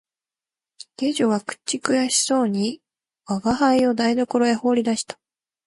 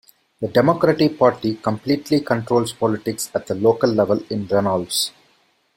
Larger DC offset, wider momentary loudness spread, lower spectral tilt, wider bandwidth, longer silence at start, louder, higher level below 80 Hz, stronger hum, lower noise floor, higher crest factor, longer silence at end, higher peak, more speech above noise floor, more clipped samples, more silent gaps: neither; first, 10 LU vs 7 LU; second, -3.5 dB/octave vs -5 dB/octave; second, 11.5 kHz vs 16.5 kHz; first, 1 s vs 0.4 s; about the same, -21 LUFS vs -19 LUFS; about the same, -58 dBFS vs -56 dBFS; neither; first, under -90 dBFS vs -61 dBFS; about the same, 20 dB vs 18 dB; about the same, 0.55 s vs 0.65 s; about the same, -2 dBFS vs -2 dBFS; first, over 70 dB vs 42 dB; neither; neither